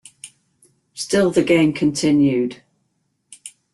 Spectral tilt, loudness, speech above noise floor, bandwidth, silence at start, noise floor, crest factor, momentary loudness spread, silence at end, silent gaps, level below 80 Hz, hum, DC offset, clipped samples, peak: -5.5 dB/octave; -17 LUFS; 53 dB; 12.5 kHz; 0.25 s; -69 dBFS; 16 dB; 23 LU; 0.25 s; none; -56 dBFS; none; under 0.1%; under 0.1%; -4 dBFS